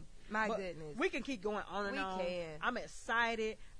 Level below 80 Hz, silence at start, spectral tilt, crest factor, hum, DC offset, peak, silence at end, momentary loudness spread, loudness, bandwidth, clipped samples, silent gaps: -58 dBFS; 0 s; -4 dB/octave; 18 dB; none; under 0.1%; -20 dBFS; 0 s; 7 LU; -38 LUFS; 10.5 kHz; under 0.1%; none